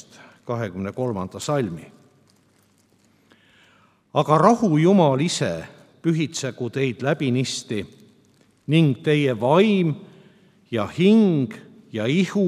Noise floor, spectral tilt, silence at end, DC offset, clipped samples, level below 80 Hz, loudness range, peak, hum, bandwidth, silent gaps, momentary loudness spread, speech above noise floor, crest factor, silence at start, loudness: -60 dBFS; -6 dB/octave; 0 s; under 0.1%; under 0.1%; -66 dBFS; 10 LU; 0 dBFS; none; 13 kHz; none; 14 LU; 40 dB; 22 dB; 0.45 s; -21 LUFS